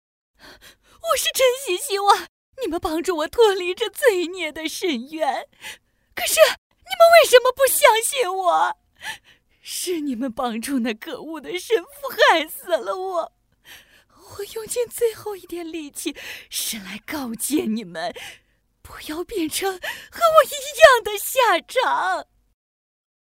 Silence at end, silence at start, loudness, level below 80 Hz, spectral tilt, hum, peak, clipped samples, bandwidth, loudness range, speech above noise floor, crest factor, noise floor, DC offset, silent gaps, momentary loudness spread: 1.05 s; 0.45 s; -20 LUFS; -56 dBFS; -1.5 dB/octave; none; 0 dBFS; under 0.1%; 16.5 kHz; 11 LU; 31 dB; 22 dB; -52 dBFS; under 0.1%; 2.29-2.53 s, 6.58-6.70 s; 18 LU